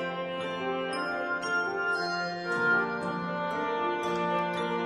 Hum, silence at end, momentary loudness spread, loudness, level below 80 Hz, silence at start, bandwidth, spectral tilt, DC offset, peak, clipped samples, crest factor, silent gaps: none; 0 s; 6 LU; -30 LUFS; -70 dBFS; 0 s; 12.5 kHz; -5 dB/octave; under 0.1%; -16 dBFS; under 0.1%; 14 dB; none